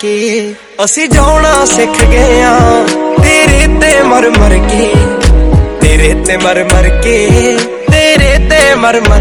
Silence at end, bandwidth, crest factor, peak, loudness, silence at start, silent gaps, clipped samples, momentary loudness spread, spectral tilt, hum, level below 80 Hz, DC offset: 0 s; 17 kHz; 6 dB; 0 dBFS; -7 LUFS; 0 s; none; 6%; 5 LU; -4.5 dB/octave; none; -12 dBFS; under 0.1%